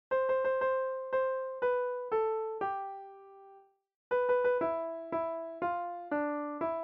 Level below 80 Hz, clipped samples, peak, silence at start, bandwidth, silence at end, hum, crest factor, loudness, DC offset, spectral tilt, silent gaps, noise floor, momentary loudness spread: -74 dBFS; under 0.1%; -20 dBFS; 0.1 s; 4 kHz; 0 s; none; 14 dB; -33 LUFS; under 0.1%; -3.5 dB/octave; 3.96-4.11 s; -60 dBFS; 8 LU